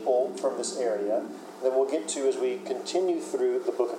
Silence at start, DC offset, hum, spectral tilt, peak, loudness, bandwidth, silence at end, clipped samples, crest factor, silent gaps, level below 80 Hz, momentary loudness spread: 0 s; under 0.1%; none; -3.5 dB/octave; -12 dBFS; -28 LUFS; 13 kHz; 0 s; under 0.1%; 16 dB; none; under -90 dBFS; 4 LU